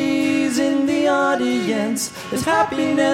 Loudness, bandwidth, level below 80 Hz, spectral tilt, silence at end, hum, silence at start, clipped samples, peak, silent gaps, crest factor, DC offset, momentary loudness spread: -19 LUFS; 16.5 kHz; -56 dBFS; -4 dB/octave; 0 s; none; 0 s; under 0.1%; -4 dBFS; none; 14 dB; under 0.1%; 6 LU